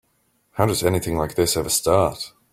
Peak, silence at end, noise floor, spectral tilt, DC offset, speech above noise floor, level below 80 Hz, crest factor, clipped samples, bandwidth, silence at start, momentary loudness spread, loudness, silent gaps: -2 dBFS; 0.25 s; -66 dBFS; -4 dB/octave; under 0.1%; 45 dB; -44 dBFS; 20 dB; under 0.1%; 16.5 kHz; 0.55 s; 7 LU; -21 LUFS; none